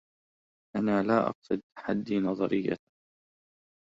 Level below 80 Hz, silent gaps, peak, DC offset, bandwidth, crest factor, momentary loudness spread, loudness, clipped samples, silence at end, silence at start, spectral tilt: -66 dBFS; 1.35-1.42 s, 1.63-1.70 s; -12 dBFS; under 0.1%; 7.6 kHz; 20 dB; 9 LU; -30 LUFS; under 0.1%; 1.1 s; 0.75 s; -8.5 dB/octave